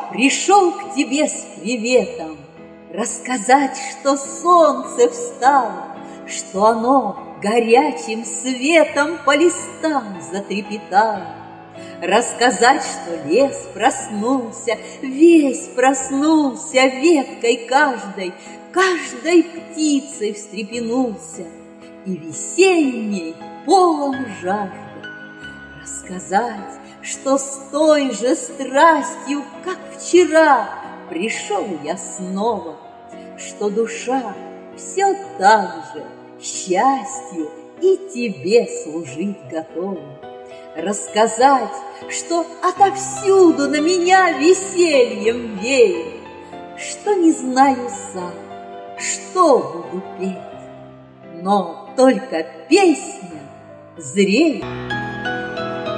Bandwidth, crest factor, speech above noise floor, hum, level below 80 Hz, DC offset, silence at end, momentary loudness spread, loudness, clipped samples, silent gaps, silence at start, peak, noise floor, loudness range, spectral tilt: 10.5 kHz; 18 dB; 23 dB; none; -60 dBFS; under 0.1%; 0 s; 19 LU; -17 LUFS; under 0.1%; none; 0 s; 0 dBFS; -40 dBFS; 6 LU; -3.5 dB/octave